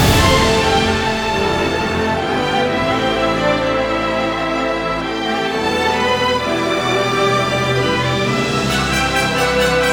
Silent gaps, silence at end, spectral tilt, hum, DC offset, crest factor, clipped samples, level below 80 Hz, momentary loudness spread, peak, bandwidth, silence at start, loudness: none; 0 s; -4.5 dB/octave; none; under 0.1%; 16 dB; under 0.1%; -32 dBFS; 4 LU; 0 dBFS; over 20 kHz; 0 s; -16 LUFS